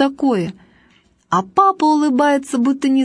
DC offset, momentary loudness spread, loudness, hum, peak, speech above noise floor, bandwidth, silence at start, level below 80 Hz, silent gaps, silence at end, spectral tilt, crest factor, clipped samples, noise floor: under 0.1%; 7 LU; -16 LUFS; none; -2 dBFS; 39 dB; 11 kHz; 0 s; -60 dBFS; none; 0 s; -5.5 dB/octave; 16 dB; under 0.1%; -55 dBFS